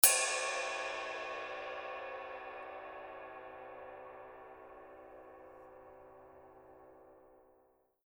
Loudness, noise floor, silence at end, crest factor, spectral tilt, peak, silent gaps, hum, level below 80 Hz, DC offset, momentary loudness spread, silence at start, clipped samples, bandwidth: -38 LUFS; -71 dBFS; 0.65 s; 34 dB; 1 dB/octave; -6 dBFS; none; none; -74 dBFS; under 0.1%; 22 LU; 0 s; under 0.1%; over 20 kHz